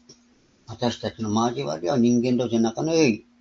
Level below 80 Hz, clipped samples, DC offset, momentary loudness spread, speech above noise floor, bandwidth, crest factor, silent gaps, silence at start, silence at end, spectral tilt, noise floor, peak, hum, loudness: -60 dBFS; under 0.1%; under 0.1%; 8 LU; 37 dB; 7.4 kHz; 18 dB; none; 0.1 s; 0.2 s; -5.5 dB/octave; -59 dBFS; -6 dBFS; none; -23 LUFS